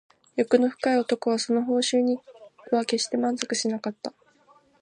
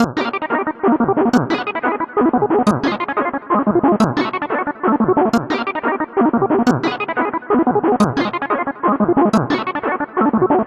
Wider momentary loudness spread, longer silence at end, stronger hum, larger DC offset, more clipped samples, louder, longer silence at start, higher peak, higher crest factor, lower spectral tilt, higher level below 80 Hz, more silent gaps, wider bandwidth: first, 10 LU vs 5 LU; first, 0.7 s vs 0 s; neither; neither; neither; second, -25 LUFS vs -17 LUFS; first, 0.35 s vs 0 s; about the same, -4 dBFS vs -2 dBFS; first, 22 dB vs 16 dB; second, -3 dB/octave vs -6.5 dB/octave; second, -78 dBFS vs -50 dBFS; neither; second, 10.5 kHz vs 12.5 kHz